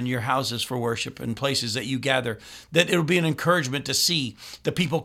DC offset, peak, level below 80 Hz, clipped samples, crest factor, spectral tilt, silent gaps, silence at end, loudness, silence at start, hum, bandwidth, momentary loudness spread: under 0.1%; -2 dBFS; -58 dBFS; under 0.1%; 22 dB; -4 dB/octave; none; 0 s; -24 LUFS; 0 s; none; 16.5 kHz; 9 LU